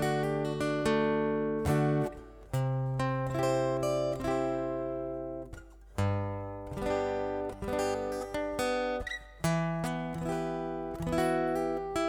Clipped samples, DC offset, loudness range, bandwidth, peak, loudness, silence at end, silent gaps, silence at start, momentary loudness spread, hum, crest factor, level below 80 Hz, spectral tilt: under 0.1%; under 0.1%; 4 LU; 18.5 kHz; -16 dBFS; -32 LUFS; 0 s; none; 0 s; 8 LU; none; 14 dB; -50 dBFS; -6.5 dB/octave